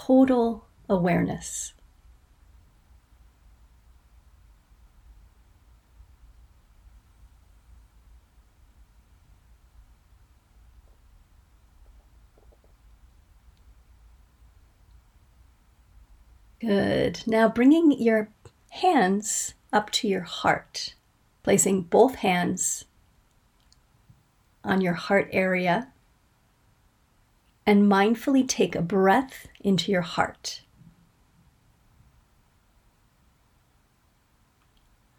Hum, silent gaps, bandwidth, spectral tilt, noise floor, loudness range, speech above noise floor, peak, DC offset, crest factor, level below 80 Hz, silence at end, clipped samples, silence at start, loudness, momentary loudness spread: none; none; 18.5 kHz; -4.5 dB/octave; -65 dBFS; 9 LU; 42 dB; -6 dBFS; under 0.1%; 22 dB; -56 dBFS; 4.6 s; under 0.1%; 0 s; -24 LUFS; 14 LU